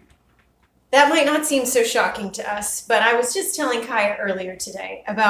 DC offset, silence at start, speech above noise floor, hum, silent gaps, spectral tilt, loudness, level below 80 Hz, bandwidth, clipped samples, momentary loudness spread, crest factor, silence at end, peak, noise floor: under 0.1%; 0.9 s; 41 dB; none; none; -2 dB/octave; -20 LUFS; -60 dBFS; 16 kHz; under 0.1%; 12 LU; 20 dB; 0 s; 0 dBFS; -61 dBFS